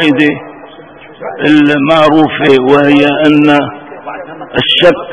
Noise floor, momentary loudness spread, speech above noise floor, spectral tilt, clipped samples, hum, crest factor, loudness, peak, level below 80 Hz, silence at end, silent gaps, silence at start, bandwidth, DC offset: -33 dBFS; 18 LU; 25 dB; -6.5 dB/octave; 2%; none; 10 dB; -8 LUFS; 0 dBFS; -46 dBFS; 0 s; none; 0 s; 8.6 kHz; under 0.1%